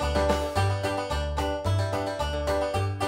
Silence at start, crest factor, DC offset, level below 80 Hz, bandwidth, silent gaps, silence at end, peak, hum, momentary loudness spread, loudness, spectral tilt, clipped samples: 0 s; 18 dB; under 0.1%; -36 dBFS; 16 kHz; none; 0 s; -10 dBFS; none; 4 LU; -27 LUFS; -5.5 dB/octave; under 0.1%